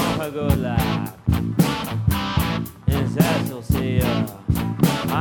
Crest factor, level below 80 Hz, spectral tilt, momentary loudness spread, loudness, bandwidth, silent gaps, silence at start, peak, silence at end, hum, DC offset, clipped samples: 18 dB; -32 dBFS; -6 dB/octave; 5 LU; -22 LUFS; over 20 kHz; none; 0 s; -4 dBFS; 0 s; none; under 0.1%; under 0.1%